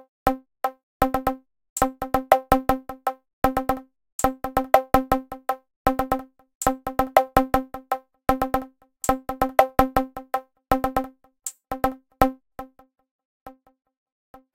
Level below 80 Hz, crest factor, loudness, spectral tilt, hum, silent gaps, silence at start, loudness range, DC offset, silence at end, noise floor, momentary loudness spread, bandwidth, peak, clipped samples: -40 dBFS; 24 dB; -24 LUFS; -5 dB/octave; none; 0.83-1.00 s, 1.70-1.76 s, 3.33-3.42 s, 4.12-4.19 s, 5.76-5.85 s, 6.55-6.61 s, 13.11-13.19 s, 13.25-13.46 s; 0.25 s; 5 LU; under 0.1%; 1.05 s; -42 dBFS; 13 LU; 17 kHz; -2 dBFS; under 0.1%